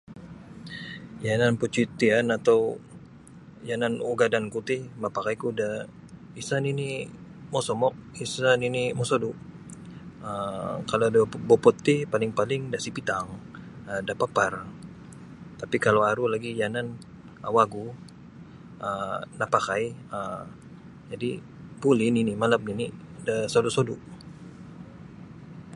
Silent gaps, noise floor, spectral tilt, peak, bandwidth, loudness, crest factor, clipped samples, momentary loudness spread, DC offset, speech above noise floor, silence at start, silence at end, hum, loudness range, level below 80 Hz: none; -48 dBFS; -5.5 dB/octave; -4 dBFS; 11.5 kHz; -26 LUFS; 24 dB; under 0.1%; 22 LU; under 0.1%; 22 dB; 0.1 s; 0 s; none; 5 LU; -60 dBFS